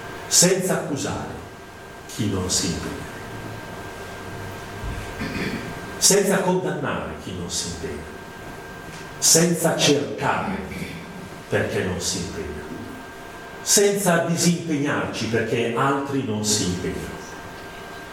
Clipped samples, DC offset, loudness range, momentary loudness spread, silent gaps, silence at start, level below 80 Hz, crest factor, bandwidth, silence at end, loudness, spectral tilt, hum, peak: under 0.1%; under 0.1%; 7 LU; 20 LU; none; 0 s; -46 dBFS; 22 dB; 17 kHz; 0 s; -22 LUFS; -3 dB/octave; none; -2 dBFS